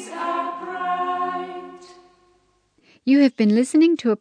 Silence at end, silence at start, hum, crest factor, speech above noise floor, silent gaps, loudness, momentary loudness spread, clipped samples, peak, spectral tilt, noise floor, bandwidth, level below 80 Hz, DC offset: 0.05 s; 0 s; none; 16 dB; 46 dB; none; -20 LUFS; 14 LU; under 0.1%; -6 dBFS; -5.5 dB/octave; -63 dBFS; 10.5 kHz; -72 dBFS; under 0.1%